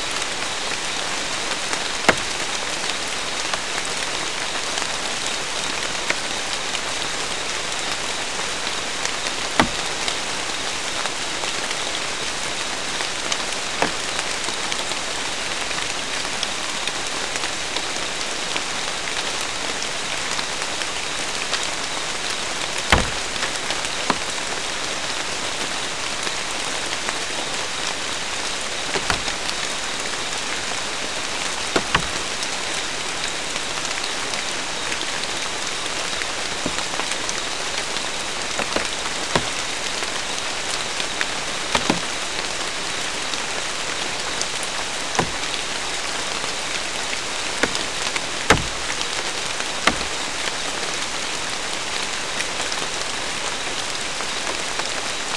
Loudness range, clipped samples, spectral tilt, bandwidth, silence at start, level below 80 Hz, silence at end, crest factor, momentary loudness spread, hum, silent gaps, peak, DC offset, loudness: 2 LU; under 0.1%; -1 dB/octave; 12 kHz; 0 s; -46 dBFS; 0 s; 26 dB; 3 LU; none; none; 0 dBFS; 2%; -23 LUFS